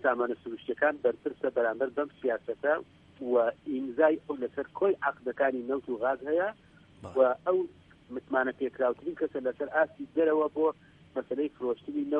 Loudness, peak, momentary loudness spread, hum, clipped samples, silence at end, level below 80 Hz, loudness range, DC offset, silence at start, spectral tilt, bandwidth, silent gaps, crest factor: -30 LUFS; -12 dBFS; 9 LU; none; under 0.1%; 0 s; -70 dBFS; 1 LU; under 0.1%; 0 s; -7.5 dB/octave; 4.1 kHz; none; 18 dB